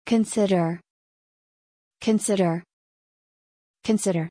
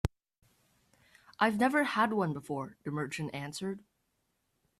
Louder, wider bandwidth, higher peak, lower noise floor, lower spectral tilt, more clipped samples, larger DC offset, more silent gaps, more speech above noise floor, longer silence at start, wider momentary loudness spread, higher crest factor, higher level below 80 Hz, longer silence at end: first, -24 LUFS vs -32 LUFS; second, 10.5 kHz vs 14.5 kHz; about the same, -10 dBFS vs -12 dBFS; first, under -90 dBFS vs -79 dBFS; about the same, -5.5 dB/octave vs -5.5 dB/octave; neither; neither; first, 0.90-1.91 s, 2.73-3.74 s vs none; first, over 68 dB vs 47 dB; about the same, 0.05 s vs 0.05 s; about the same, 11 LU vs 11 LU; second, 16 dB vs 24 dB; second, -66 dBFS vs -56 dBFS; second, 0 s vs 1 s